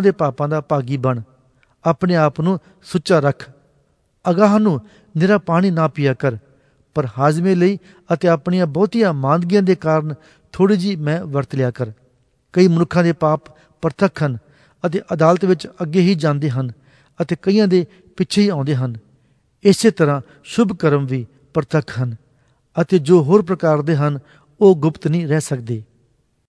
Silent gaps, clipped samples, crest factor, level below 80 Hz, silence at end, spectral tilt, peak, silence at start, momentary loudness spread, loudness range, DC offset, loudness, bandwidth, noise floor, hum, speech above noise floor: none; under 0.1%; 18 dB; -56 dBFS; 0.65 s; -7 dB/octave; 0 dBFS; 0 s; 12 LU; 3 LU; under 0.1%; -17 LUFS; 11 kHz; -61 dBFS; none; 44 dB